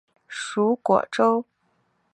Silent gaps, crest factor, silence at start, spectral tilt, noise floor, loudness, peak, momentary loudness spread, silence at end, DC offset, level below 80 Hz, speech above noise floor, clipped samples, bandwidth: none; 20 dB; 0.3 s; -5 dB/octave; -69 dBFS; -23 LUFS; -4 dBFS; 12 LU; 0.7 s; under 0.1%; -72 dBFS; 47 dB; under 0.1%; 11 kHz